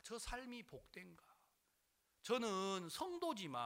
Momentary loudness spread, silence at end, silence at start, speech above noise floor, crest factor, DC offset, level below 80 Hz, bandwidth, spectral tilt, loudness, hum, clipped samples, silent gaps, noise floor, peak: 17 LU; 0 s; 0.05 s; 37 dB; 20 dB; under 0.1%; -66 dBFS; 16 kHz; -3.5 dB/octave; -45 LUFS; none; under 0.1%; none; -83 dBFS; -26 dBFS